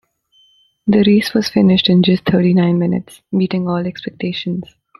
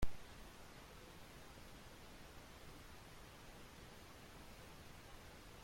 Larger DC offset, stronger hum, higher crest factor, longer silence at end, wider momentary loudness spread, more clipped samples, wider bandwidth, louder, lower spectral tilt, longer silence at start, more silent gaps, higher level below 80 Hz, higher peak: neither; neither; second, 14 dB vs 24 dB; first, 0.35 s vs 0 s; first, 12 LU vs 1 LU; neither; second, 12.5 kHz vs 16.5 kHz; first, -15 LUFS vs -58 LUFS; first, -7 dB/octave vs -4 dB/octave; first, 0.85 s vs 0 s; neither; first, -50 dBFS vs -58 dBFS; first, -2 dBFS vs -26 dBFS